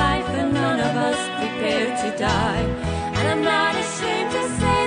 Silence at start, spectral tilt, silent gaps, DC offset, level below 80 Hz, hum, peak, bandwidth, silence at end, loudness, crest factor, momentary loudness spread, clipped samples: 0 s; -4.5 dB/octave; none; under 0.1%; -36 dBFS; none; -8 dBFS; 10 kHz; 0 s; -22 LUFS; 14 dB; 5 LU; under 0.1%